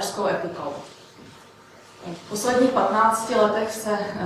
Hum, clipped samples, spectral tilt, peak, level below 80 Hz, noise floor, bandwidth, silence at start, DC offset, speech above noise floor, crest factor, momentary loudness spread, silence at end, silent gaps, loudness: none; under 0.1%; -4 dB/octave; -6 dBFS; -62 dBFS; -48 dBFS; 16 kHz; 0 s; under 0.1%; 26 dB; 18 dB; 19 LU; 0 s; none; -22 LUFS